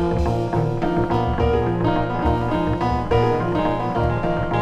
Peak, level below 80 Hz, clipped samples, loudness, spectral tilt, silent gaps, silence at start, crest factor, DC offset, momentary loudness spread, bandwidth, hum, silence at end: -6 dBFS; -30 dBFS; under 0.1%; -21 LUFS; -8.5 dB/octave; none; 0 s; 12 dB; 0.8%; 2 LU; 8.6 kHz; none; 0 s